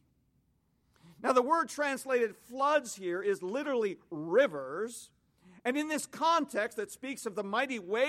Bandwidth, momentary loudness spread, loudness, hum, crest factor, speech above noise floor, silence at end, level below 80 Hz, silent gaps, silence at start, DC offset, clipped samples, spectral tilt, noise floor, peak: 16 kHz; 10 LU; -32 LUFS; none; 20 dB; 41 dB; 0 s; -78 dBFS; none; 1.05 s; under 0.1%; under 0.1%; -3.5 dB/octave; -73 dBFS; -12 dBFS